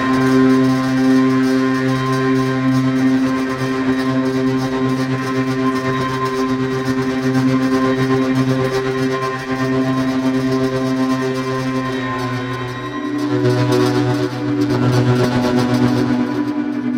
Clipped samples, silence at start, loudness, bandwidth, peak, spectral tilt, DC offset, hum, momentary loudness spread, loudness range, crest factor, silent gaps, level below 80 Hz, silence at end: under 0.1%; 0 s; -17 LUFS; 16 kHz; -2 dBFS; -6.5 dB/octave; under 0.1%; none; 6 LU; 3 LU; 14 dB; none; -46 dBFS; 0 s